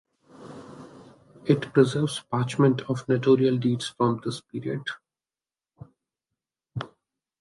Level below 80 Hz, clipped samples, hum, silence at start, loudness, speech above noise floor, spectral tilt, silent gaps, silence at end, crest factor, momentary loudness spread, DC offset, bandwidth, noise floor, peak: -66 dBFS; under 0.1%; none; 0.4 s; -25 LUFS; over 66 dB; -6.5 dB/octave; none; 0.55 s; 22 dB; 23 LU; under 0.1%; 11.5 kHz; under -90 dBFS; -6 dBFS